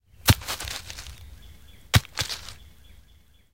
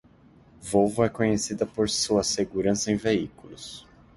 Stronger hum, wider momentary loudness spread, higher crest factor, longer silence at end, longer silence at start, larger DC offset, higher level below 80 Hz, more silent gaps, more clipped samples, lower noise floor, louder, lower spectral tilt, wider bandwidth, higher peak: neither; first, 21 LU vs 17 LU; first, 26 dB vs 20 dB; first, 1 s vs 0.35 s; second, 0.25 s vs 0.6 s; first, 0.2% vs under 0.1%; first, -40 dBFS vs -52 dBFS; neither; neither; about the same, -57 dBFS vs -55 dBFS; about the same, -26 LUFS vs -25 LUFS; about the same, -3.5 dB/octave vs -4 dB/octave; first, 17 kHz vs 11.5 kHz; first, -2 dBFS vs -8 dBFS